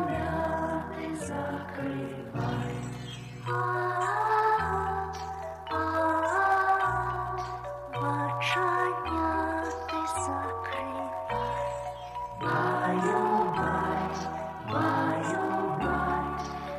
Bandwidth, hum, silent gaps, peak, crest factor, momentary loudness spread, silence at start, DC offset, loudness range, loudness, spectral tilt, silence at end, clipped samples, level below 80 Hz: 15.5 kHz; none; none; -14 dBFS; 16 dB; 11 LU; 0 s; under 0.1%; 5 LU; -30 LUFS; -5.5 dB/octave; 0 s; under 0.1%; -50 dBFS